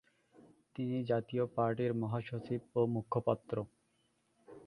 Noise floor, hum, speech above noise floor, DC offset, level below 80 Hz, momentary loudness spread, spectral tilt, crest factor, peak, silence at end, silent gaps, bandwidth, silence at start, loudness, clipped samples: -76 dBFS; none; 41 dB; under 0.1%; -70 dBFS; 8 LU; -9.5 dB/octave; 22 dB; -16 dBFS; 0 s; none; 10.5 kHz; 0.75 s; -36 LUFS; under 0.1%